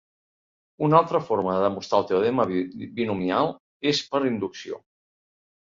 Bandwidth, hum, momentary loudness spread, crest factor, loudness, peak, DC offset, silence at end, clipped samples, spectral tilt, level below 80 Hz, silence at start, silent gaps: 7.6 kHz; none; 12 LU; 22 dB; -24 LUFS; -2 dBFS; under 0.1%; 0.9 s; under 0.1%; -6 dB/octave; -62 dBFS; 0.8 s; 3.60-3.80 s